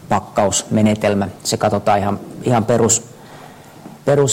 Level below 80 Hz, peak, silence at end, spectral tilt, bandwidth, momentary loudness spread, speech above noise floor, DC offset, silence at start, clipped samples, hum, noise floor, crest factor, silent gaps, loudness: -50 dBFS; -2 dBFS; 0 s; -4.5 dB/octave; 16.5 kHz; 6 LU; 23 dB; under 0.1%; 0.05 s; under 0.1%; none; -39 dBFS; 14 dB; none; -17 LUFS